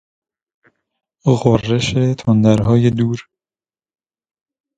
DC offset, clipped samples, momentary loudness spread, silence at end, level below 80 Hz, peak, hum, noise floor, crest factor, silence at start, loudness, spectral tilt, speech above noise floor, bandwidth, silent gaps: under 0.1%; under 0.1%; 8 LU; 1.55 s; -44 dBFS; 0 dBFS; none; under -90 dBFS; 18 dB; 1.25 s; -15 LUFS; -7 dB/octave; over 76 dB; 9 kHz; none